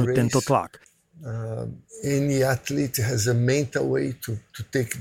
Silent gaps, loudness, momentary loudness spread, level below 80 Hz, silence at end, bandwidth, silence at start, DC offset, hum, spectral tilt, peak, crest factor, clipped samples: none; -25 LUFS; 13 LU; -54 dBFS; 0 s; 16.5 kHz; 0 s; under 0.1%; none; -5.5 dB/octave; -6 dBFS; 18 dB; under 0.1%